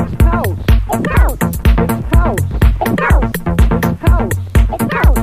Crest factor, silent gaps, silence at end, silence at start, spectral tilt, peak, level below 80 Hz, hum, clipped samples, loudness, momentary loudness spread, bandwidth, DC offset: 12 dB; none; 0 s; 0 s; -6.5 dB/octave; 0 dBFS; -14 dBFS; none; under 0.1%; -14 LUFS; 2 LU; 16 kHz; under 0.1%